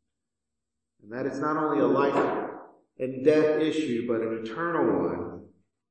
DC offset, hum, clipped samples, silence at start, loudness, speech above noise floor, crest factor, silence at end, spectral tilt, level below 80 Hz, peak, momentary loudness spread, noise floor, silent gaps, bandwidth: under 0.1%; none; under 0.1%; 1.05 s; -26 LUFS; 61 dB; 20 dB; 0.45 s; -7 dB/octave; -72 dBFS; -8 dBFS; 15 LU; -87 dBFS; none; 8.8 kHz